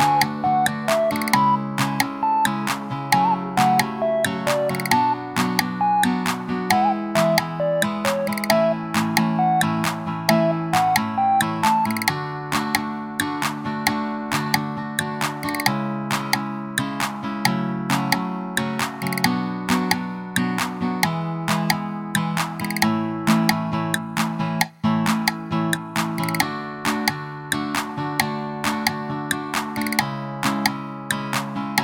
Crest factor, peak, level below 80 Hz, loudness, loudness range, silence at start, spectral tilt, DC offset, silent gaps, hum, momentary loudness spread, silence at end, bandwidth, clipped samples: 22 dB; 0 dBFS; -58 dBFS; -22 LUFS; 4 LU; 0 s; -4.5 dB/octave; under 0.1%; none; none; 6 LU; 0 s; over 20 kHz; under 0.1%